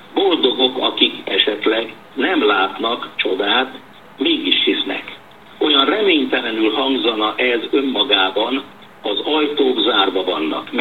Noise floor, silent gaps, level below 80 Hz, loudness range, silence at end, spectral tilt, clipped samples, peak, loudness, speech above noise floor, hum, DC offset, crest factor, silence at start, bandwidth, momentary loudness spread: -40 dBFS; none; -66 dBFS; 2 LU; 0 s; -4.5 dB/octave; under 0.1%; 0 dBFS; -16 LUFS; 22 dB; none; 0.4%; 18 dB; 0 s; 12.5 kHz; 7 LU